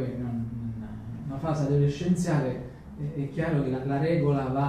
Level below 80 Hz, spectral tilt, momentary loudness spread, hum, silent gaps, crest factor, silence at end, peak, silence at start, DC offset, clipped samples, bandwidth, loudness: -48 dBFS; -8 dB/octave; 13 LU; none; none; 14 dB; 0 s; -14 dBFS; 0 s; under 0.1%; under 0.1%; 10.5 kHz; -28 LUFS